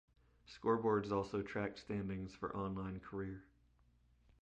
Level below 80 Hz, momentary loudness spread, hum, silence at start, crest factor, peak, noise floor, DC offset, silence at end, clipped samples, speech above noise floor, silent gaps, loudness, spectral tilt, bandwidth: -64 dBFS; 11 LU; 60 Hz at -70 dBFS; 0.45 s; 18 dB; -24 dBFS; -72 dBFS; under 0.1%; 0.95 s; under 0.1%; 32 dB; none; -41 LUFS; -7.5 dB/octave; 8.6 kHz